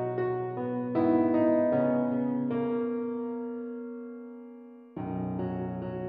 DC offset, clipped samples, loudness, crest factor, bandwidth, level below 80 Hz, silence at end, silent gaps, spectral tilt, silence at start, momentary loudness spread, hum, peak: under 0.1%; under 0.1%; -30 LUFS; 16 dB; 4.3 kHz; -64 dBFS; 0 s; none; -9 dB/octave; 0 s; 18 LU; none; -14 dBFS